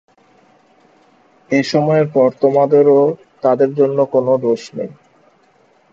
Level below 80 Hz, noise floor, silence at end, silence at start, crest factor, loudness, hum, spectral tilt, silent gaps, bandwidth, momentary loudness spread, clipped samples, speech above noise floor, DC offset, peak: -64 dBFS; -54 dBFS; 1 s; 1.5 s; 16 dB; -14 LUFS; none; -7 dB/octave; none; 7.6 kHz; 9 LU; under 0.1%; 40 dB; under 0.1%; 0 dBFS